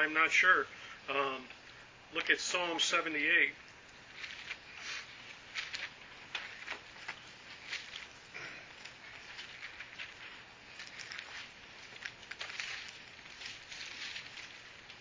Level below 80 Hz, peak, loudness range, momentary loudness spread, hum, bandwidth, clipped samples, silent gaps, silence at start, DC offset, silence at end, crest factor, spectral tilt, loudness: -72 dBFS; -12 dBFS; 14 LU; 21 LU; none; 7.8 kHz; under 0.1%; none; 0 s; under 0.1%; 0 s; 26 dB; -1 dB/octave; -36 LUFS